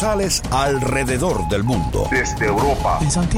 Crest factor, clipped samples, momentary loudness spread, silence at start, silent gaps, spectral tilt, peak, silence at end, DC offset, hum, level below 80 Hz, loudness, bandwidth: 12 dB; under 0.1%; 2 LU; 0 s; none; -4.5 dB/octave; -6 dBFS; 0 s; under 0.1%; none; -28 dBFS; -19 LUFS; 16.5 kHz